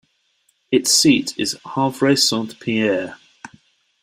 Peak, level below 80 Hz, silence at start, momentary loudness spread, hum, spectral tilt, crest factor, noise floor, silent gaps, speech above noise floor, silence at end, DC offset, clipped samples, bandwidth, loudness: -2 dBFS; -60 dBFS; 0.7 s; 11 LU; none; -3 dB/octave; 18 dB; -65 dBFS; none; 47 dB; 0.55 s; under 0.1%; under 0.1%; 16 kHz; -17 LUFS